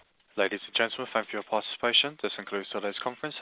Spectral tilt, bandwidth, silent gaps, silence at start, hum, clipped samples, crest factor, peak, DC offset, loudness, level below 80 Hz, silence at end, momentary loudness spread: 0.5 dB/octave; 4 kHz; none; 0.35 s; none; under 0.1%; 20 dB; -10 dBFS; under 0.1%; -29 LUFS; -76 dBFS; 0 s; 11 LU